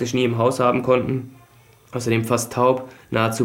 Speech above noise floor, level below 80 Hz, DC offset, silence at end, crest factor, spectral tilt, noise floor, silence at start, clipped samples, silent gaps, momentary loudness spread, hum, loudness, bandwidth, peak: 31 dB; -56 dBFS; under 0.1%; 0 s; 18 dB; -5.5 dB/octave; -51 dBFS; 0 s; under 0.1%; none; 10 LU; none; -21 LUFS; 16.5 kHz; -4 dBFS